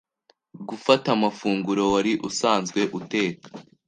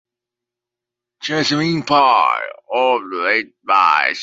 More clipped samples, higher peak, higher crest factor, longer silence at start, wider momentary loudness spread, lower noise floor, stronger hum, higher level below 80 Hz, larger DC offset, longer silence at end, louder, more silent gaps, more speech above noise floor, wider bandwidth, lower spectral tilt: neither; about the same, -2 dBFS vs 0 dBFS; about the same, 22 dB vs 18 dB; second, 0.55 s vs 1.2 s; first, 16 LU vs 10 LU; second, -65 dBFS vs -85 dBFS; neither; about the same, -64 dBFS vs -64 dBFS; neither; first, 0.25 s vs 0 s; second, -23 LUFS vs -16 LUFS; neither; second, 42 dB vs 69 dB; first, 9.8 kHz vs 8 kHz; about the same, -4.5 dB/octave vs -4.5 dB/octave